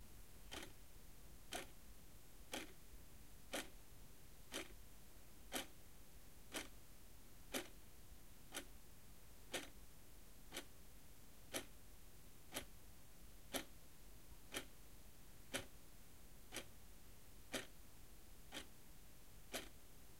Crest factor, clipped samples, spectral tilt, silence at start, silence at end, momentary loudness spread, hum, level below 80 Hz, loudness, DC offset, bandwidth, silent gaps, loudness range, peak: 28 dB; under 0.1%; -2.5 dB/octave; 0 s; 0 s; 14 LU; none; -66 dBFS; -55 LUFS; 0.1%; 16 kHz; none; 2 LU; -28 dBFS